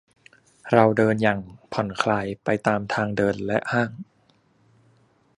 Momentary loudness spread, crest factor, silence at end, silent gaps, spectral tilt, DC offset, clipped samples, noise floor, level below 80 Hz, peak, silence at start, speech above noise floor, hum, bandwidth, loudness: 11 LU; 24 dB; 1.35 s; none; -6.5 dB/octave; under 0.1%; under 0.1%; -62 dBFS; -56 dBFS; -2 dBFS; 0.65 s; 40 dB; none; 11 kHz; -23 LUFS